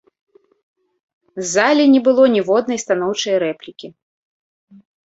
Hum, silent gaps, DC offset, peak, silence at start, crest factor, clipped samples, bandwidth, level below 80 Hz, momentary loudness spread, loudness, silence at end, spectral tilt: none; none; under 0.1%; -2 dBFS; 1.35 s; 16 dB; under 0.1%; 8 kHz; -64 dBFS; 20 LU; -15 LUFS; 1.2 s; -3.5 dB/octave